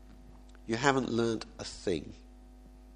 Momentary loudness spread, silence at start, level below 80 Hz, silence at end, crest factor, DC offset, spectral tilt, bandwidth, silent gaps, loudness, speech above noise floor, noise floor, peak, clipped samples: 22 LU; 0 s; -54 dBFS; 0 s; 26 dB; under 0.1%; -5 dB/octave; 10.5 kHz; none; -32 LUFS; 21 dB; -53 dBFS; -8 dBFS; under 0.1%